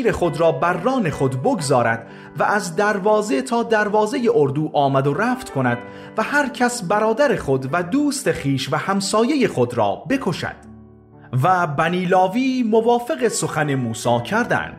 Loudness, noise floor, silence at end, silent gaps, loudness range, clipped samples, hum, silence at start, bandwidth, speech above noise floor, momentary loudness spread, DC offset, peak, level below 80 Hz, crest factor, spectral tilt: -19 LUFS; -44 dBFS; 0 s; none; 2 LU; under 0.1%; none; 0 s; 15.5 kHz; 25 dB; 5 LU; under 0.1%; -4 dBFS; -50 dBFS; 14 dB; -5.5 dB/octave